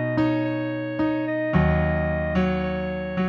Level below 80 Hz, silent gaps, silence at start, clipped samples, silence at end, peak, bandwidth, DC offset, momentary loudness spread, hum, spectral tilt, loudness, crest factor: -36 dBFS; none; 0 s; under 0.1%; 0 s; -8 dBFS; 6.6 kHz; under 0.1%; 6 LU; none; -9.5 dB/octave; -24 LUFS; 16 dB